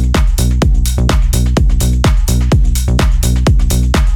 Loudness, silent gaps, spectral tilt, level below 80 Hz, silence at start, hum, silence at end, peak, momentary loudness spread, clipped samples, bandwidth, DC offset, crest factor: -13 LUFS; none; -5.5 dB/octave; -12 dBFS; 0 s; none; 0 s; 0 dBFS; 1 LU; under 0.1%; 18 kHz; under 0.1%; 10 dB